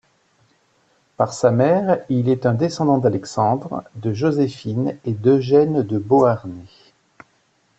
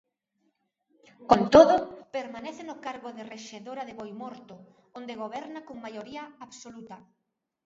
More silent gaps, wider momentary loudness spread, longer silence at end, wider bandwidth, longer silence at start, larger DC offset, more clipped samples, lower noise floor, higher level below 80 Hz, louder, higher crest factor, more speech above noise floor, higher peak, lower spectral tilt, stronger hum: neither; second, 9 LU vs 26 LU; first, 1.15 s vs 0.7 s; about the same, 8.4 kHz vs 7.8 kHz; about the same, 1.2 s vs 1.2 s; neither; neither; second, -62 dBFS vs -75 dBFS; about the same, -58 dBFS vs -60 dBFS; first, -19 LUFS vs -24 LUFS; second, 16 dB vs 26 dB; second, 44 dB vs 48 dB; about the same, -4 dBFS vs -2 dBFS; first, -7.5 dB/octave vs -5.5 dB/octave; neither